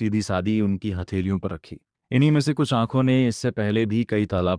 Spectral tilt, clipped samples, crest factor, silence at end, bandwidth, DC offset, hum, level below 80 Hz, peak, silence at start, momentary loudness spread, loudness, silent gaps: -7 dB/octave; under 0.1%; 14 dB; 0 s; 10.5 kHz; under 0.1%; none; -50 dBFS; -8 dBFS; 0 s; 8 LU; -23 LUFS; none